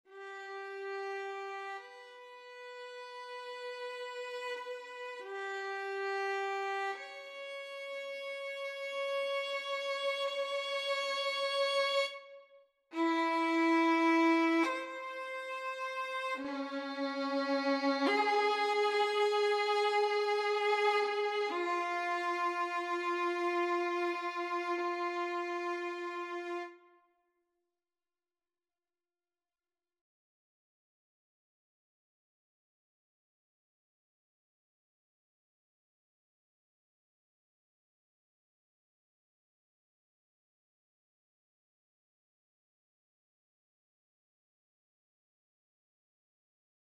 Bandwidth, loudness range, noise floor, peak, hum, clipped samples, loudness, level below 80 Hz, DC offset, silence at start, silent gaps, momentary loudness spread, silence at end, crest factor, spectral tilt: 13 kHz; 13 LU; under -90 dBFS; -20 dBFS; none; under 0.1%; -34 LUFS; under -90 dBFS; under 0.1%; 0.1 s; none; 14 LU; 20.15 s; 18 dB; -1.5 dB/octave